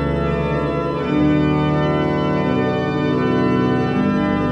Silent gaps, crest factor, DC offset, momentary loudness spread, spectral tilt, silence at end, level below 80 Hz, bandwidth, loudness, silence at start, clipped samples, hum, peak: none; 12 dB; under 0.1%; 3 LU; -8.5 dB/octave; 0 s; -36 dBFS; 8 kHz; -18 LUFS; 0 s; under 0.1%; none; -4 dBFS